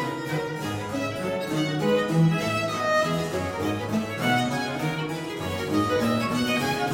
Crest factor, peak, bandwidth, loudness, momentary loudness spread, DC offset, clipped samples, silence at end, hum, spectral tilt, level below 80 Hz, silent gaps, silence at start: 14 dB; -10 dBFS; 16.5 kHz; -26 LUFS; 7 LU; under 0.1%; under 0.1%; 0 s; none; -5.5 dB/octave; -56 dBFS; none; 0 s